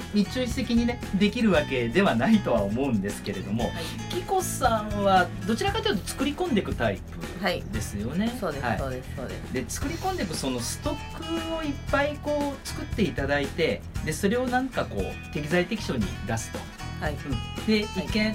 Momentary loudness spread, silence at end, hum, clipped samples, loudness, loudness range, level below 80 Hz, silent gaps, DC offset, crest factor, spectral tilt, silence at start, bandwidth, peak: 10 LU; 0 s; none; under 0.1%; -27 LUFS; 5 LU; -40 dBFS; none; under 0.1%; 18 dB; -5 dB/octave; 0 s; 16 kHz; -8 dBFS